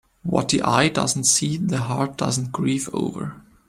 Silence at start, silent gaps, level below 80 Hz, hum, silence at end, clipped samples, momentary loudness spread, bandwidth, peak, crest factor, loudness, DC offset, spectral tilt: 0.25 s; none; -54 dBFS; none; 0.3 s; under 0.1%; 9 LU; 16 kHz; -4 dBFS; 20 dB; -21 LUFS; under 0.1%; -4 dB/octave